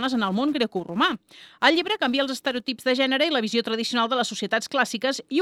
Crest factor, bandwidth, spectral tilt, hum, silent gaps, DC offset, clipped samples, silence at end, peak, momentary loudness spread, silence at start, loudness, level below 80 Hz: 22 dB; 15.5 kHz; -3.5 dB/octave; none; none; under 0.1%; under 0.1%; 0 s; -2 dBFS; 6 LU; 0 s; -23 LUFS; -70 dBFS